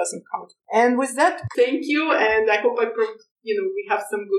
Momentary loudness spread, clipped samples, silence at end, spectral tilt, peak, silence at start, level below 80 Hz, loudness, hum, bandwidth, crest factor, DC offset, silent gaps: 10 LU; under 0.1%; 0 s; -4 dB/octave; -6 dBFS; 0 s; -62 dBFS; -21 LUFS; none; 13.5 kHz; 16 dB; under 0.1%; 3.31-3.36 s